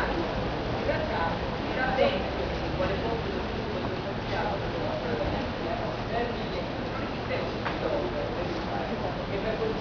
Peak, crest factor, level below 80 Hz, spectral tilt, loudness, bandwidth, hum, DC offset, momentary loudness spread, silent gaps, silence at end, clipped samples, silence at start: -12 dBFS; 16 dB; -42 dBFS; -6.5 dB/octave; -30 LUFS; 5.4 kHz; none; under 0.1%; 4 LU; none; 0 s; under 0.1%; 0 s